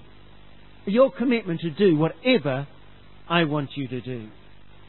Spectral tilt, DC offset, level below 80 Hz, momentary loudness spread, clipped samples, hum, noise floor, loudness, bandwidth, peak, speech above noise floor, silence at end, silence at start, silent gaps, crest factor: -11 dB/octave; 0.6%; -58 dBFS; 16 LU; under 0.1%; 50 Hz at -50 dBFS; -50 dBFS; -23 LUFS; 4.3 kHz; -6 dBFS; 27 dB; 0.55 s; 0.85 s; none; 20 dB